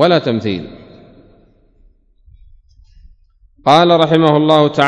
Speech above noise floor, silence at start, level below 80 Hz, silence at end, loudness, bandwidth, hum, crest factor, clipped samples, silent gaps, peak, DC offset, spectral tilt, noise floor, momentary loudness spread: 39 dB; 0 s; -48 dBFS; 0 s; -12 LUFS; 11 kHz; none; 16 dB; 0.2%; none; 0 dBFS; under 0.1%; -6.5 dB/octave; -50 dBFS; 13 LU